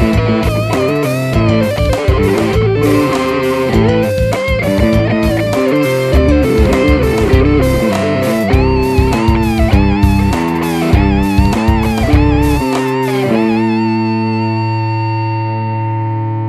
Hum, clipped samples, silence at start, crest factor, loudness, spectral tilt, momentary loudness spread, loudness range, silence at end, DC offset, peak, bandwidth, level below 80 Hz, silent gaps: none; under 0.1%; 0 s; 12 dB; -13 LUFS; -7 dB/octave; 5 LU; 2 LU; 0 s; under 0.1%; 0 dBFS; 15.5 kHz; -20 dBFS; none